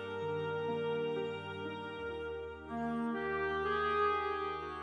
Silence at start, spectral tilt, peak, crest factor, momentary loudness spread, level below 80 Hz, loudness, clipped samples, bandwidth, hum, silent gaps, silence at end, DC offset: 0 s; -6.5 dB/octave; -20 dBFS; 16 dB; 10 LU; -60 dBFS; -37 LUFS; under 0.1%; 10 kHz; none; none; 0 s; under 0.1%